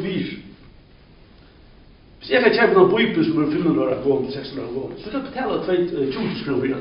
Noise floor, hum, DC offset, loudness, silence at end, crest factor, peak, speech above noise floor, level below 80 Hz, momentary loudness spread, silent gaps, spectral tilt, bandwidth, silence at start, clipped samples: -48 dBFS; none; under 0.1%; -20 LUFS; 0 s; 20 dB; -2 dBFS; 29 dB; -50 dBFS; 14 LU; none; -4.5 dB/octave; 5.4 kHz; 0 s; under 0.1%